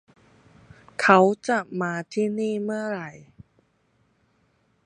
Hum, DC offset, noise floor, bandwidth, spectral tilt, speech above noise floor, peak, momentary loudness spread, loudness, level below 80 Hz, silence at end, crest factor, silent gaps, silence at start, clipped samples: none; under 0.1%; -67 dBFS; 11 kHz; -5.5 dB/octave; 44 dB; 0 dBFS; 16 LU; -23 LUFS; -68 dBFS; 1.7 s; 26 dB; none; 1 s; under 0.1%